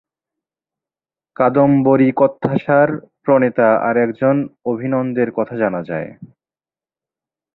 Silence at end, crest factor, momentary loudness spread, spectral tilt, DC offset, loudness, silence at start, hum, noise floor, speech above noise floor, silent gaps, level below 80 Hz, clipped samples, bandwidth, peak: 1.3 s; 16 dB; 10 LU; -11.5 dB/octave; under 0.1%; -16 LUFS; 1.4 s; none; under -90 dBFS; over 75 dB; none; -58 dBFS; under 0.1%; 4.1 kHz; 0 dBFS